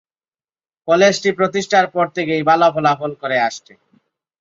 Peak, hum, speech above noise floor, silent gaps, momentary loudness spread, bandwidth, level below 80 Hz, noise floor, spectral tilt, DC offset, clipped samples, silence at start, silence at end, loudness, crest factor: -2 dBFS; none; over 74 dB; none; 8 LU; 7.8 kHz; -64 dBFS; under -90 dBFS; -4.5 dB/octave; under 0.1%; under 0.1%; 0.85 s; 0.85 s; -16 LUFS; 16 dB